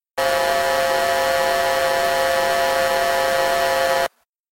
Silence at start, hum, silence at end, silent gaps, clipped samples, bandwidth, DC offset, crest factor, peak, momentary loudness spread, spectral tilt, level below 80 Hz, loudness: 0.15 s; none; 0.45 s; none; under 0.1%; 16.5 kHz; under 0.1%; 12 dB; -8 dBFS; 1 LU; -1.5 dB/octave; -48 dBFS; -19 LUFS